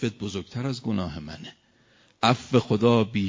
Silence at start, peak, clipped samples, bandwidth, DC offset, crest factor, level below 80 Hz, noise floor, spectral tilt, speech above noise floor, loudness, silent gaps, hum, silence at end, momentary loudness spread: 0 s; -4 dBFS; under 0.1%; 7.6 kHz; under 0.1%; 22 dB; -52 dBFS; -60 dBFS; -6.5 dB/octave; 36 dB; -25 LUFS; none; none; 0 s; 18 LU